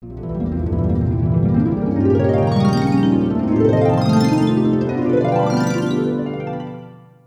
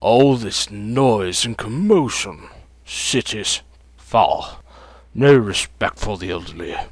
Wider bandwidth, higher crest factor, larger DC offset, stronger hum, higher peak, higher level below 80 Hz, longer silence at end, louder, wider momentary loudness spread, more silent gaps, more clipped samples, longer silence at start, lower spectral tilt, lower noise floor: about the same, 12 kHz vs 11 kHz; second, 12 dB vs 18 dB; neither; neither; about the same, -4 dBFS vs -2 dBFS; about the same, -36 dBFS vs -40 dBFS; first, 0.35 s vs 0.05 s; about the same, -17 LUFS vs -19 LUFS; second, 10 LU vs 15 LU; neither; neither; about the same, 0 s vs 0 s; first, -8 dB/octave vs -4.5 dB/octave; second, -39 dBFS vs -44 dBFS